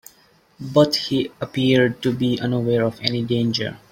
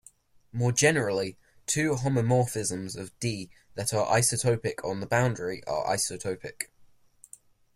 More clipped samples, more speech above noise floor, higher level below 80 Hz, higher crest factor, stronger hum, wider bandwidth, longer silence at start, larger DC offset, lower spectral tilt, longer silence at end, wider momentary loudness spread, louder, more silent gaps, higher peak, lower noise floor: neither; first, 36 dB vs 30 dB; about the same, -56 dBFS vs -60 dBFS; about the same, 18 dB vs 20 dB; neither; about the same, 16.5 kHz vs 15.5 kHz; about the same, 0.6 s vs 0.55 s; neither; first, -6 dB/octave vs -4 dB/octave; second, 0.15 s vs 0.9 s; second, 7 LU vs 14 LU; first, -20 LUFS vs -28 LUFS; neither; first, -2 dBFS vs -8 dBFS; about the same, -56 dBFS vs -58 dBFS